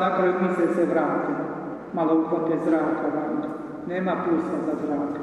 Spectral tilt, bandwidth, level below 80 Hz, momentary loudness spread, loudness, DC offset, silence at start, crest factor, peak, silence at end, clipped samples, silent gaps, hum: -8.5 dB/octave; 10.5 kHz; -64 dBFS; 9 LU; -25 LUFS; under 0.1%; 0 s; 14 dB; -10 dBFS; 0 s; under 0.1%; none; none